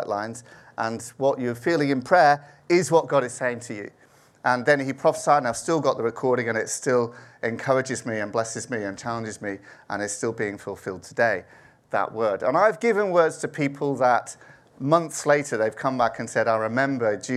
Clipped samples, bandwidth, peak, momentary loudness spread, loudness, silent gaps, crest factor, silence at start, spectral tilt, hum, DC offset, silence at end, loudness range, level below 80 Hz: under 0.1%; 13.5 kHz; -4 dBFS; 12 LU; -24 LUFS; none; 20 dB; 0 s; -5 dB/octave; none; under 0.1%; 0 s; 6 LU; -68 dBFS